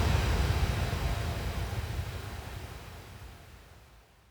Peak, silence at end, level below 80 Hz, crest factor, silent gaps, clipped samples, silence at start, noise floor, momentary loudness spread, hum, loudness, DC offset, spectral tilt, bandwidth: -14 dBFS; 0.3 s; -36 dBFS; 18 dB; none; under 0.1%; 0 s; -57 dBFS; 20 LU; none; -33 LUFS; under 0.1%; -5.5 dB/octave; over 20 kHz